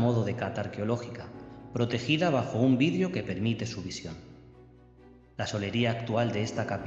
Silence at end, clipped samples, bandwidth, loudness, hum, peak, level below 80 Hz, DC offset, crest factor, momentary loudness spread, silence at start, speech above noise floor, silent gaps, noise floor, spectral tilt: 0 s; under 0.1%; 8 kHz; -30 LUFS; none; -12 dBFS; -60 dBFS; under 0.1%; 18 dB; 16 LU; 0 s; 26 dB; none; -55 dBFS; -6.5 dB/octave